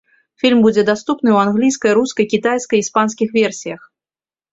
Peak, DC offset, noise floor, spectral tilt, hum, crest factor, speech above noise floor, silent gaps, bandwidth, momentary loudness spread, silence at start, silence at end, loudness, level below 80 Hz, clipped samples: -2 dBFS; under 0.1%; under -90 dBFS; -4.5 dB/octave; none; 14 dB; over 75 dB; none; 8 kHz; 6 LU; 0.45 s; 0.75 s; -15 LUFS; -58 dBFS; under 0.1%